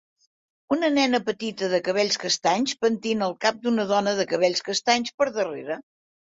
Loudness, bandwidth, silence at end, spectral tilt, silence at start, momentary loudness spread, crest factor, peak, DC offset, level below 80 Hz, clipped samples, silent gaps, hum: -24 LUFS; 8 kHz; 0.5 s; -3 dB/octave; 0.7 s; 7 LU; 20 dB; -6 dBFS; under 0.1%; -68 dBFS; under 0.1%; 5.14-5.18 s; none